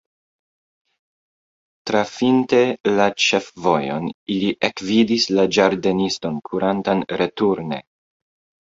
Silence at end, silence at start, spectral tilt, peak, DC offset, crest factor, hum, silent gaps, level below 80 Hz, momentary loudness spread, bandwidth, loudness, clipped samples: 0.85 s; 1.85 s; -4.5 dB/octave; -2 dBFS; under 0.1%; 20 dB; none; 2.80-2.84 s, 4.14-4.26 s; -58 dBFS; 9 LU; 8 kHz; -19 LUFS; under 0.1%